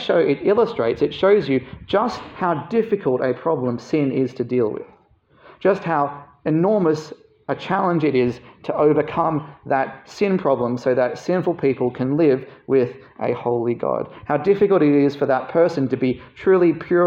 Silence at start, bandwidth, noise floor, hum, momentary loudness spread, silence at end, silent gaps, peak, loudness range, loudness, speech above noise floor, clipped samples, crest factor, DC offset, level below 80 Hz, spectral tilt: 0 s; 7.4 kHz; -55 dBFS; none; 9 LU; 0 s; none; -4 dBFS; 3 LU; -20 LUFS; 36 dB; under 0.1%; 14 dB; under 0.1%; -58 dBFS; -8 dB/octave